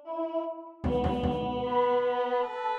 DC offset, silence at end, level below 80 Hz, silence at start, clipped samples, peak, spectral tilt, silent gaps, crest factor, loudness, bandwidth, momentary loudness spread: under 0.1%; 0 s; -44 dBFS; 0 s; under 0.1%; -14 dBFS; -8 dB/octave; none; 14 dB; -29 LUFS; 6.2 kHz; 8 LU